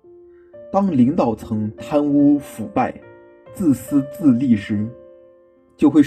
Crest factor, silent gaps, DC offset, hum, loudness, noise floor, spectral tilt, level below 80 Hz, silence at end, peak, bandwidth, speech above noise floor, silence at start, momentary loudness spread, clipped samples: 16 dB; none; under 0.1%; none; -19 LUFS; -52 dBFS; -8 dB/octave; -54 dBFS; 0 s; -2 dBFS; 14.5 kHz; 35 dB; 0.55 s; 9 LU; under 0.1%